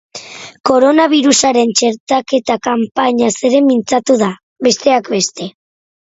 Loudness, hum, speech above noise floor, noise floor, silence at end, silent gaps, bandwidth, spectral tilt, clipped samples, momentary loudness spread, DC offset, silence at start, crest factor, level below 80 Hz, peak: -13 LUFS; none; 19 dB; -32 dBFS; 0.55 s; 0.60-0.64 s, 2.00-2.07 s, 4.43-4.56 s; 8 kHz; -3 dB/octave; under 0.1%; 10 LU; under 0.1%; 0.15 s; 14 dB; -56 dBFS; 0 dBFS